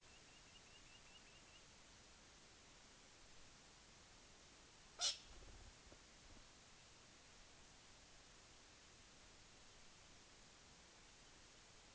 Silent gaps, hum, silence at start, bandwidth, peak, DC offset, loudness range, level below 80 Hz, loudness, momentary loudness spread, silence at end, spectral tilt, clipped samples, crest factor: none; none; 0 s; 9.4 kHz; -30 dBFS; under 0.1%; 13 LU; -72 dBFS; -57 LUFS; 2 LU; 0 s; -0.5 dB/octave; under 0.1%; 30 dB